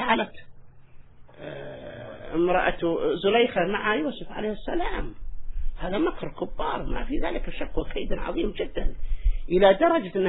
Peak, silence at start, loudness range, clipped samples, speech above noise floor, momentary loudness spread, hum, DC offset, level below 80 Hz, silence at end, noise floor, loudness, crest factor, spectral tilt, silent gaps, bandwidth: -6 dBFS; 0 s; 6 LU; under 0.1%; 21 dB; 18 LU; none; under 0.1%; -32 dBFS; 0 s; -45 dBFS; -26 LUFS; 20 dB; -9.5 dB/octave; none; 4.1 kHz